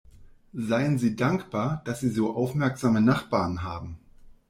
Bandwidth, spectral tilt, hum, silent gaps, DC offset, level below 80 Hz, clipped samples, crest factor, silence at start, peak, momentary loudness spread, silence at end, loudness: 15.5 kHz; -7 dB/octave; none; none; under 0.1%; -54 dBFS; under 0.1%; 18 dB; 0.2 s; -10 dBFS; 13 LU; 0.15 s; -26 LUFS